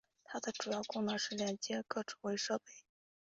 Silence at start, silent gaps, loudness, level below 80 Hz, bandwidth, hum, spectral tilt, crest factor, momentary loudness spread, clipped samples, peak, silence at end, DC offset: 0.3 s; none; -40 LUFS; -80 dBFS; 8 kHz; none; -3 dB/octave; 20 dB; 7 LU; under 0.1%; -22 dBFS; 0.45 s; under 0.1%